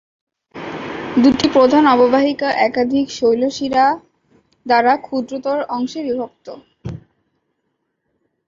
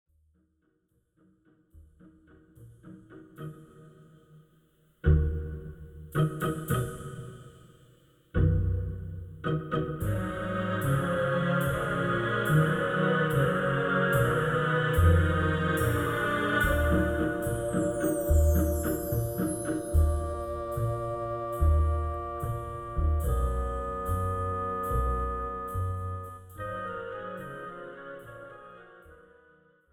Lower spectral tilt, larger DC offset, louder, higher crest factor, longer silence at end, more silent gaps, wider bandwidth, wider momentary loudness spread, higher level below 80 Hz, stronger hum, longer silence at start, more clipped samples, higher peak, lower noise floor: second, -5 dB/octave vs -6.5 dB/octave; neither; first, -16 LUFS vs -29 LUFS; about the same, 16 dB vs 18 dB; first, 1.5 s vs 0.8 s; neither; second, 7.6 kHz vs 17.5 kHz; first, 20 LU vs 16 LU; second, -52 dBFS vs -36 dBFS; neither; second, 0.55 s vs 1.75 s; neither; first, -2 dBFS vs -10 dBFS; about the same, -71 dBFS vs -73 dBFS